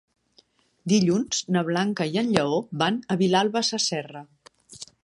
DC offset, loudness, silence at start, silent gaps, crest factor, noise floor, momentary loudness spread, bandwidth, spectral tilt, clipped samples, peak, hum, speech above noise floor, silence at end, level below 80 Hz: under 0.1%; -24 LUFS; 0.85 s; none; 24 dB; -62 dBFS; 17 LU; 11.5 kHz; -4.5 dB/octave; under 0.1%; -2 dBFS; none; 38 dB; 0.2 s; -64 dBFS